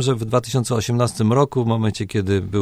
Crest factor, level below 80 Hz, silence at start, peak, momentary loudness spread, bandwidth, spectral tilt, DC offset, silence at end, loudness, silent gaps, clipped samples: 16 dB; -50 dBFS; 0 s; -4 dBFS; 4 LU; 15 kHz; -6 dB/octave; under 0.1%; 0 s; -20 LUFS; none; under 0.1%